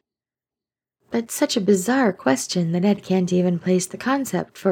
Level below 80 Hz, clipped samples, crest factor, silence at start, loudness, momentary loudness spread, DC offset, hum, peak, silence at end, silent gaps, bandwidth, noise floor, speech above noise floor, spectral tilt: -66 dBFS; under 0.1%; 18 dB; 1.1 s; -21 LUFS; 6 LU; under 0.1%; none; -4 dBFS; 0 s; none; 17.5 kHz; under -90 dBFS; over 70 dB; -5 dB/octave